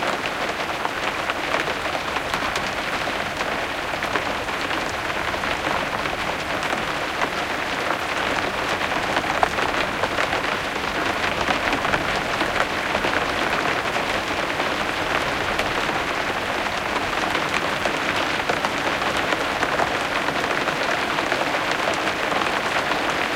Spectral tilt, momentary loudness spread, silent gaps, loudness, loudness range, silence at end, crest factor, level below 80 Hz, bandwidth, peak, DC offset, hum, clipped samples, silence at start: -3 dB/octave; 3 LU; none; -22 LUFS; 2 LU; 0 s; 22 dB; -44 dBFS; 17 kHz; 0 dBFS; under 0.1%; none; under 0.1%; 0 s